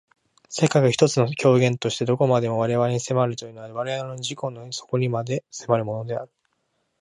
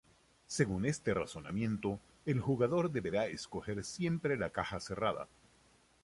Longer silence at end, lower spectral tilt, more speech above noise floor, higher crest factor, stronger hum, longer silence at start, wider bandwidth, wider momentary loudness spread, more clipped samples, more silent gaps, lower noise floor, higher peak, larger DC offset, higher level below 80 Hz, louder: about the same, 0.75 s vs 0.8 s; about the same, -5.5 dB/octave vs -6 dB/octave; first, 50 dB vs 32 dB; about the same, 20 dB vs 20 dB; neither; about the same, 0.5 s vs 0.5 s; about the same, 11 kHz vs 11.5 kHz; first, 13 LU vs 9 LU; neither; neither; first, -72 dBFS vs -68 dBFS; first, -4 dBFS vs -16 dBFS; neither; about the same, -64 dBFS vs -60 dBFS; first, -23 LUFS vs -36 LUFS